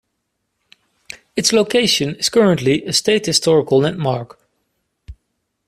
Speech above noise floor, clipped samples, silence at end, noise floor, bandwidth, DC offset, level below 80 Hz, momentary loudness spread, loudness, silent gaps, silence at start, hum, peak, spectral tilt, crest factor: 57 dB; under 0.1%; 0.55 s; -73 dBFS; 15 kHz; under 0.1%; -50 dBFS; 12 LU; -16 LUFS; none; 1.1 s; none; 0 dBFS; -4 dB/octave; 18 dB